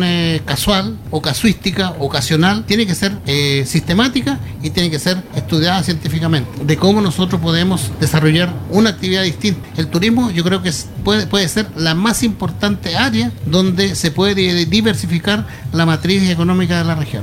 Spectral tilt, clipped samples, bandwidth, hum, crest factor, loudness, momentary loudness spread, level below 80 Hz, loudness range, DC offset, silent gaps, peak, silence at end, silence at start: -5 dB/octave; under 0.1%; 16.5 kHz; none; 14 dB; -15 LUFS; 5 LU; -38 dBFS; 1 LU; under 0.1%; none; 0 dBFS; 0 s; 0 s